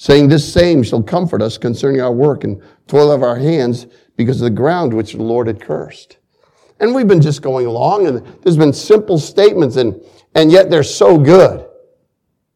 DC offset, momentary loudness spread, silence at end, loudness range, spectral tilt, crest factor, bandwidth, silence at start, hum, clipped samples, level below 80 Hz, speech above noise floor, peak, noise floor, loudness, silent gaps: under 0.1%; 11 LU; 0.9 s; 6 LU; -6.5 dB/octave; 12 dB; 13 kHz; 0 s; none; 0.4%; -42 dBFS; 57 dB; 0 dBFS; -68 dBFS; -12 LUFS; none